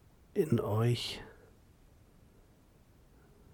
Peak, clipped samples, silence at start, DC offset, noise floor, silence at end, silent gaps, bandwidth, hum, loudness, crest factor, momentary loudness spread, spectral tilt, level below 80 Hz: -18 dBFS; under 0.1%; 0.35 s; under 0.1%; -62 dBFS; 2.2 s; none; 18 kHz; none; -33 LUFS; 20 dB; 14 LU; -6.5 dB/octave; -62 dBFS